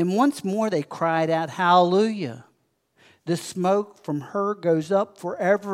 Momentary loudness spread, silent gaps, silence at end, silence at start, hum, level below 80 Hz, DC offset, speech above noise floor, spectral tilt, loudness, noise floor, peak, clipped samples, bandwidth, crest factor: 12 LU; none; 0 s; 0 s; none; -78 dBFS; under 0.1%; 45 dB; -6 dB/octave; -23 LUFS; -68 dBFS; -4 dBFS; under 0.1%; 15.5 kHz; 18 dB